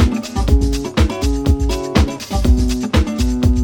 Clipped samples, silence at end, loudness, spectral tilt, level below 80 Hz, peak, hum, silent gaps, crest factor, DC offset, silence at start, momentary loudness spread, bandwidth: under 0.1%; 0 s; -17 LUFS; -6 dB/octave; -18 dBFS; 0 dBFS; none; none; 14 dB; under 0.1%; 0 s; 3 LU; 17.5 kHz